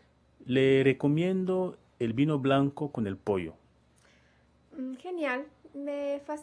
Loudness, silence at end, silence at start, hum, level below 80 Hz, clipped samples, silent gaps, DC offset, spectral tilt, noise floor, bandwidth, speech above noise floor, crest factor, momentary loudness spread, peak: -29 LUFS; 0 s; 0.4 s; none; -66 dBFS; under 0.1%; none; under 0.1%; -8 dB/octave; -64 dBFS; 10.5 kHz; 36 dB; 20 dB; 16 LU; -10 dBFS